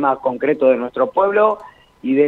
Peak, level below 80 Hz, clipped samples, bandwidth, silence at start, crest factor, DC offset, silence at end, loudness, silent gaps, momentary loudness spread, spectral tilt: -2 dBFS; -60 dBFS; under 0.1%; 4.2 kHz; 0 s; 14 dB; under 0.1%; 0 s; -17 LUFS; none; 8 LU; -8 dB/octave